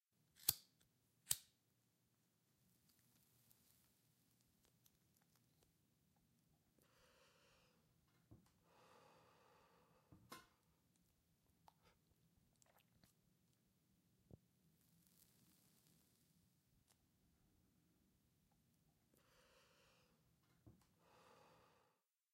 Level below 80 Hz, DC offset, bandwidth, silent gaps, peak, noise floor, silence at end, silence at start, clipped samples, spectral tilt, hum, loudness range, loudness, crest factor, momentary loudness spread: -88 dBFS; under 0.1%; 16 kHz; none; -16 dBFS; -86 dBFS; 0.9 s; 0.4 s; under 0.1%; -0.5 dB/octave; none; 20 LU; -44 LUFS; 46 dB; 20 LU